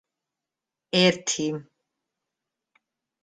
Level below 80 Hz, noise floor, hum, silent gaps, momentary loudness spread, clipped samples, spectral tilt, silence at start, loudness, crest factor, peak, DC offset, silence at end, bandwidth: -70 dBFS; -88 dBFS; none; none; 11 LU; under 0.1%; -3.5 dB/octave; 0.95 s; -23 LUFS; 24 dB; -6 dBFS; under 0.1%; 1.6 s; 9.6 kHz